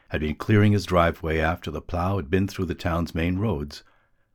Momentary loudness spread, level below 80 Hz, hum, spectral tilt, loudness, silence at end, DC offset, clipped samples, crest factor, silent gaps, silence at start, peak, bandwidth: 11 LU; -38 dBFS; none; -7 dB/octave; -24 LUFS; 0.55 s; under 0.1%; under 0.1%; 18 dB; none; 0.1 s; -6 dBFS; 16 kHz